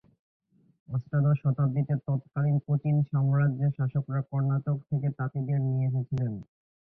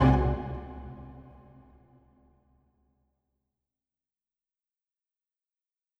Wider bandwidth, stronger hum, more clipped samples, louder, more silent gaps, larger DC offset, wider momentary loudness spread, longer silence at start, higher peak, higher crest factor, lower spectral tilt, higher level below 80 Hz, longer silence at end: second, 2.8 kHz vs 6.2 kHz; neither; neither; about the same, -28 LUFS vs -30 LUFS; neither; neither; second, 6 LU vs 27 LU; first, 0.9 s vs 0 s; second, -16 dBFS vs -10 dBFS; second, 12 dB vs 24 dB; first, -12.5 dB/octave vs -9.5 dB/octave; second, -60 dBFS vs -40 dBFS; second, 0.4 s vs 4.75 s